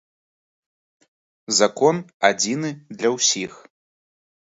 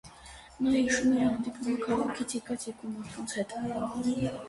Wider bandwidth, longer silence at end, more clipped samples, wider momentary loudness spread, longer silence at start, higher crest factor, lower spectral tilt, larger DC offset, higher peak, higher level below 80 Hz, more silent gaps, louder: second, 8 kHz vs 11.5 kHz; first, 1.05 s vs 0 s; neither; second, 9 LU vs 13 LU; first, 1.5 s vs 0.05 s; first, 22 dB vs 16 dB; second, -2.5 dB/octave vs -4.5 dB/octave; neither; first, 0 dBFS vs -16 dBFS; second, -70 dBFS vs -58 dBFS; first, 2.14-2.20 s vs none; first, -20 LUFS vs -31 LUFS